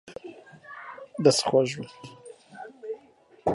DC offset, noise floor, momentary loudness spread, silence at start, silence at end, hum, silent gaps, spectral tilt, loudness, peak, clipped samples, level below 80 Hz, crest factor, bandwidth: under 0.1%; -57 dBFS; 24 LU; 0.05 s; 0 s; none; none; -4.5 dB/octave; -24 LUFS; -6 dBFS; under 0.1%; -64 dBFS; 24 dB; 11.5 kHz